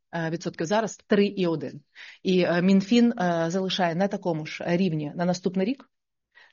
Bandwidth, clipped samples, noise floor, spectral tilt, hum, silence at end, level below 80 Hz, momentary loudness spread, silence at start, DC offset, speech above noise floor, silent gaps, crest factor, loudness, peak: 7.2 kHz; under 0.1%; -61 dBFS; -5.5 dB/octave; none; 0.75 s; -70 dBFS; 10 LU; 0.15 s; under 0.1%; 36 dB; none; 16 dB; -25 LUFS; -8 dBFS